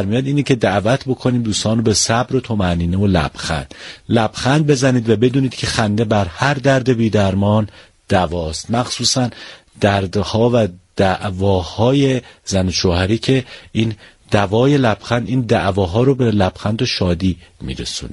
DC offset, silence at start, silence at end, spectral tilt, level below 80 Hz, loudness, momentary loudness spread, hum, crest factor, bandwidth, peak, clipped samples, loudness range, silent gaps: under 0.1%; 0 s; 0 s; -5.5 dB/octave; -38 dBFS; -17 LUFS; 8 LU; none; 16 dB; 11.5 kHz; 0 dBFS; under 0.1%; 2 LU; none